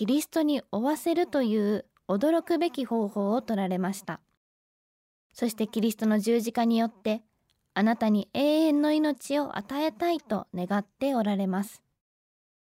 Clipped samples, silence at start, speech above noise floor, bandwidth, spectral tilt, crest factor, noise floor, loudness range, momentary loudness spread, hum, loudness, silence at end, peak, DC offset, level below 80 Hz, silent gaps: under 0.1%; 0 s; over 63 dB; 16 kHz; -6 dB/octave; 14 dB; under -90 dBFS; 4 LU; 8 LU; none; -27 LUFS; 1 s; -14 dBFS; under 0.1%; -72 dBFS; 4.37-5.30 s